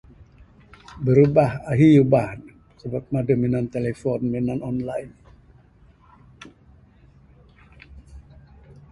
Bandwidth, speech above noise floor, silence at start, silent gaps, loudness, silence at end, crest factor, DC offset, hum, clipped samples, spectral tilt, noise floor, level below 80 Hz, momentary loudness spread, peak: 11.5 kHz; 34 dB; 0.2 s; none; -21 LUFS; 0.7 s; 20 dB; under 0.1%; none; under 0.1%; -9.5 dB/octave; -53 dBFS; -50 dBFS; 17 LU; -2 dBFS